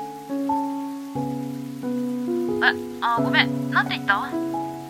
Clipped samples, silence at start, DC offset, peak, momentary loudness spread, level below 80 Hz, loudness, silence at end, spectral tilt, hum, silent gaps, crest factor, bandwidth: under 0.1%; 0 s; under 0.1%; -2 dBFS; 11 LU; -62 dBFS; -24 LUFS; 0 s; -5.5 dB/octave; none; none; 24 dB; 16 kHz